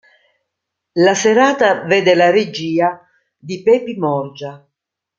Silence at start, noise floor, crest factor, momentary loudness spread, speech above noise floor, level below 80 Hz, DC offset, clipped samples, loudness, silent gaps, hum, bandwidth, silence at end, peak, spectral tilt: 0.95 s; -79 dBFS; 16 dB; 17 LU; 64 dB; -64 dBFS; under 0.1%; under 0.1%; -14 LUFS; none; none; 7.6 kHz; 0.6 s; 0 dBFS; -4.5 dB/octave